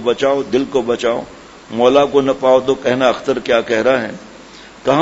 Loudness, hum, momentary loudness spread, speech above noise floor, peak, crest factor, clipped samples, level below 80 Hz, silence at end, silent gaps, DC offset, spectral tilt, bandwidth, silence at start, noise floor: -15 LUFS; none; 11 LU; 24 dB; 0 dBFS; 16 dB; under 0.1%; -50 dBFS; 0 s; none; under 0.1%; -5 dB/octave; 8 kHz; 0 s; -38 dBFS